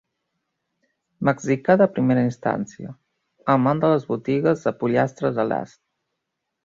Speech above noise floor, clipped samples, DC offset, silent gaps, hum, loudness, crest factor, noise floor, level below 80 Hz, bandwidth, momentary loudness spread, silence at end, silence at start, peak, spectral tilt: 59 dB; under 0.1%; under 0.1%; none; none; -21 LUFS; 20 dB; -80 dBFS; -62 dBFS; 7.6 kHz; 12 LU; 1 s; 1.2 s; -4 dBFS; -7.5 dB/octave